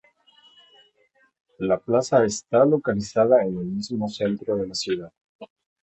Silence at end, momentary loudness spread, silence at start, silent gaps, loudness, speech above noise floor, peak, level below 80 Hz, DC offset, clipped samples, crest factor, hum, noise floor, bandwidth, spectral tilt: 0.4 s; 10 LU; 1.6 s; 5.21-5.39 s; -23 LUFS; 42 dB; -6 dBFS; -58 dBFS; under 0.1%; under 0.1%; 18 dB; none; -64 dBFS; 8.4 kHz; -5.5 dB/octave